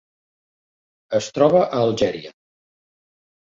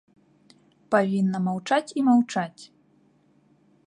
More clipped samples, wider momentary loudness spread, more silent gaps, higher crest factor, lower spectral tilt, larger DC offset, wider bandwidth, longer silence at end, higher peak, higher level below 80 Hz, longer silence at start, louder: neither; about the same, 9 LU vs 8 LU; neither; about the same, 20 dB vs 20 dB; about the same, -5.5 dB/octave vs -6.5 dB/octave; neither; second, 7.8 kHz vs 10.5 kHz; about the same, 1.15 s vs 1.2 s; first, -2 dBFS vs -6 dBFS; first, -58 dBFS vs -72 dBFS; first, 1.1 s vs 0.9 s; first, -19 LUFS vs -24 LUFS